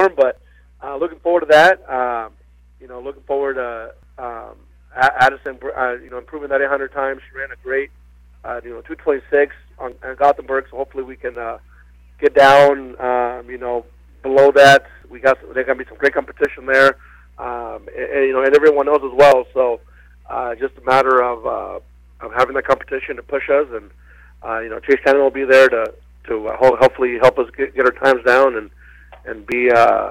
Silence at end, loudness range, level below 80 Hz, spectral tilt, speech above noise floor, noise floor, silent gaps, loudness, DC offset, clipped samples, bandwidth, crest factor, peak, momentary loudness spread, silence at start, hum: 0 s; 7 LU; -46 dBFS; -4.5 dB/octave; 29 dB; -45 dBFS; none; -16 LUFS; under 0.1%; under 0.1%; 14.5 kHz; 14 dB; -2 dBFS; 20 LU; 0 s; 60 Hz at -50 dBFS